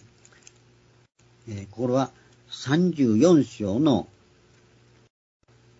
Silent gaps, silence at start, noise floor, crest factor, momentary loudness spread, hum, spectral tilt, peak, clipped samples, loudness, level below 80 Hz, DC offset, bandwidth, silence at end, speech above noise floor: none; 1.45 s; -58 dBFS; 20 dB; 20 LU; 60 Hz at -55 dBFS; -7 dB/octave; -6 dBFS; under 0.1%; -23 LUFS; -64 dBFS; under 0.1%; 7.8 kHz; 1.75 s; 36 dB